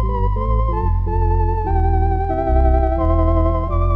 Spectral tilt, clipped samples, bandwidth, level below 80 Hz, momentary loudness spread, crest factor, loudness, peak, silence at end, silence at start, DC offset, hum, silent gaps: -11 dB/octave; under 0.1%; 3.5 kHz; -18 dBFS; 3 LU; 12 dB; -18 LUFS; -4 dBFS; 0 s; 0 s; 1%; none; none